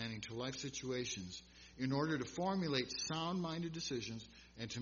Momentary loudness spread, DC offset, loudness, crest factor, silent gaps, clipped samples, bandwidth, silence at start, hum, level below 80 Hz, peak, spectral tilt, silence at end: 12 LU; under 0.1%; -41 LUFS; 22 dB; none; under 0.1%; 7.2 kHz; 0 s; none; -68 dBFS; -20 dBFS; -4 dB/octave; 0 s